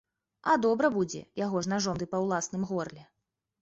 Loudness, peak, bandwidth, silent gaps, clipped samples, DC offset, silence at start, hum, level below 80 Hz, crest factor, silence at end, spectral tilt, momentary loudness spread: -30 LUFS; -12 dBFS; 8 kHz; none; under 0.1%; under 0.1%; 0.45 s; none; -64 dBFS; 18 dB; 0.6 s; -5 dB/octave; 9 LU